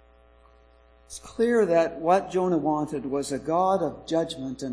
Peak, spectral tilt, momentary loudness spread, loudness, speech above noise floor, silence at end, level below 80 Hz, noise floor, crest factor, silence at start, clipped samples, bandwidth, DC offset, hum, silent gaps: -6 dBFS; -5.5 dB/octave; 10 LU; -25 LUFS; 31 dB; 0 s; -56 dBFS; -56 dBFS; 20 dB; 1.1 s; under 0.1%; 11 kHz; under 0.1%; none; none